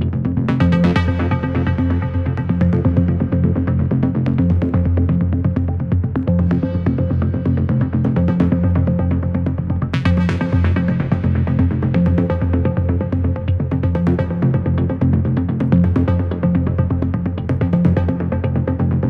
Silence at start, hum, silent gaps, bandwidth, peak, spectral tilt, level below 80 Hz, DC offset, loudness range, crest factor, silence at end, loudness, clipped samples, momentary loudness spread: 0 s; none; none; 5.2 kHz; -2 dBFS; -10 dB/octave; -30 dBFS; under 0.1%; 1 LU; 14 dB; 0 s; -17 LUFS; under 0.1%; 4 LU